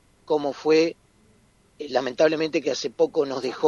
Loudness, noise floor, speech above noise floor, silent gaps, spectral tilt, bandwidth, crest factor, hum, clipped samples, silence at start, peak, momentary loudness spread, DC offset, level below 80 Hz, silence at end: -24 LUFS; -59 dBFS; 36 dB; none; -4.5 dB/octave; 7.4 kHz; 18 dB; none; under 0.1%; 0.3 s; -6 dBFS; 7 LU; under 0.1%; -66 dBFS; 0 s